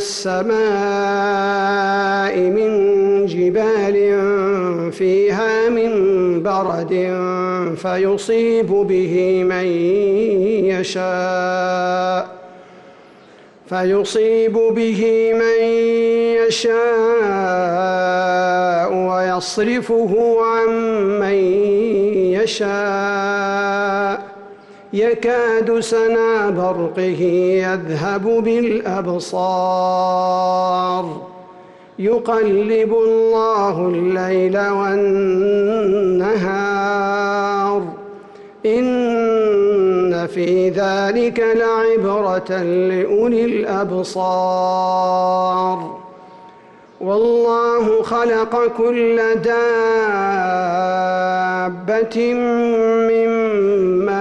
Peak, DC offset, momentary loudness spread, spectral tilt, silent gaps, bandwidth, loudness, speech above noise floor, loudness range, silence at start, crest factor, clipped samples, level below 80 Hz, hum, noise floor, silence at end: -8 dBFS; under 0.1%; 5 LU; -5.5 dB/octave; none; 11.5 kHz; -17 LUFS; 28 dB; 3 LU; 0 s; 8 dB; under 0.1%; -56 dBFS; none; -44 dBFS; 0 s